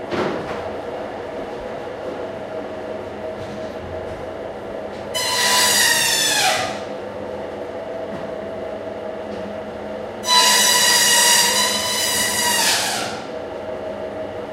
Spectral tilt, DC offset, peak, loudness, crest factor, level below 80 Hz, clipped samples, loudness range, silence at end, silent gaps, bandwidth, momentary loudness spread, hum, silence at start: -0.5 dB/octave; under 0.1%; -2 dBFS; -17 LUFS; 20 dB; -52 dBFS; under 0.1%; 15 LU; 0 s; none; 16 kHz; 18 LU; none; 0 s